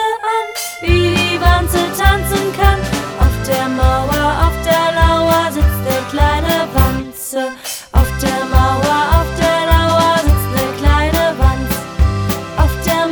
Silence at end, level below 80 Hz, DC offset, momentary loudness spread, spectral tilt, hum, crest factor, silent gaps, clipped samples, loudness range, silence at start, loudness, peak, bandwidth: 0 s; -18 dBFS; under 0.1%; 7 LU; -5 dB/octave; none; 14 dB; none; under 0.1%; 2 LU; 0 s; -14 LUFS; 0 dBFS; over 20 kHz